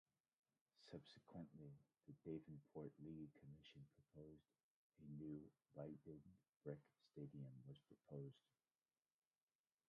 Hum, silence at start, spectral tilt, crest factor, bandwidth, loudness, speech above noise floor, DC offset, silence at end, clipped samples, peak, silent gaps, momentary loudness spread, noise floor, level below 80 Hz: none; 0.75 s; -8 dB/octave; 22 dB; 5 kHz; -61 LUFS; over 31 dB; under 0.1%; 1.5 s; under 0.1%; -38 dBFS; 4.63-4.90 s, 6.49-6.60 s; 10 LU; under -90 dBFS; -84 dBFS